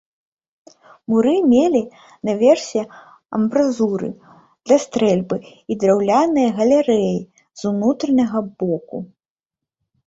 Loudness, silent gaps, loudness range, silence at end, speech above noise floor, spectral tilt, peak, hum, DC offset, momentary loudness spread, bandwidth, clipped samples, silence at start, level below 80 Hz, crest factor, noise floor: -18 LUFS; none; 3 LU; 1 s; 70 dB; -6.5 dB/octave; -2 dBFS; none; under 0.1%; 13 LU; 8 kHz; under 0.1%; 1.1 s; -60 dBFS; 16 dB; -87 dBFS